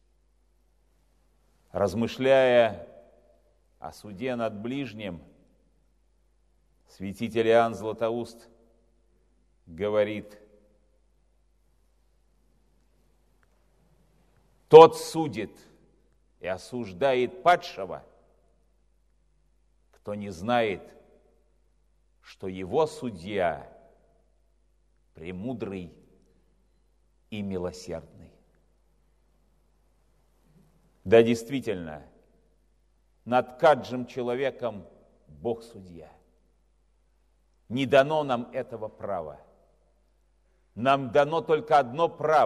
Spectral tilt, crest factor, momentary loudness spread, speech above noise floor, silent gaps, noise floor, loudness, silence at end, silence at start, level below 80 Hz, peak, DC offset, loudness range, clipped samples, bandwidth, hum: -6 dB/octave; 28 dB; 20 LU; 42 dB; none; -67 dBFS; -25 LUFS; 0 s; 1.75 s; -62 dBFS; 0 dBFS; under 0.1%; 18 LU; under 0.1%; 13.5 kHz; none